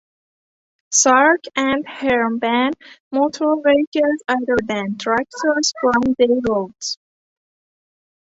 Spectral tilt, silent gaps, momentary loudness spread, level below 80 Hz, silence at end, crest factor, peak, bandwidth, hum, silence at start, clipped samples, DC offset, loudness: -2.5 dB/octave; 3.00-3.11 s, 3.87-3.92 s; 9 LU; -54 dBFS; 1.35 s; 18 dB; -2 dBFS; 8.4 kHz; none; 0.9 s; under 0.1%; under 0.1%; -18 LUFS